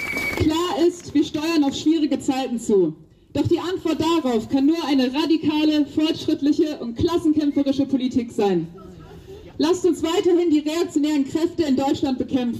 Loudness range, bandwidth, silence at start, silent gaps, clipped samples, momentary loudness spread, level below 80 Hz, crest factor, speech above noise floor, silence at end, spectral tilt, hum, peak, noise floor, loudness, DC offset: 2 LU; 15 kHz; 0 s; none; under 0.1%; 5 LU; -48 dBFS; 12 dB; 20 dB; 0 s; -5.5 dB/octave; none; -8 dBFS; -40 dBFS; -21 LUFS; under 0.1%